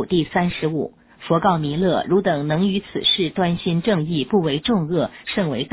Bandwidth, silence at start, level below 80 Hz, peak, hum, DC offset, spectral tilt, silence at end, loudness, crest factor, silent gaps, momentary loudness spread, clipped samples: 4 kHz; 0 s; -48 dBFS; -4 dBFS; none; under 0.1%; -10.5 dB/octave; 0.05 s; -20 LUFS; 16 dB; none; 6 LU; under 0.1%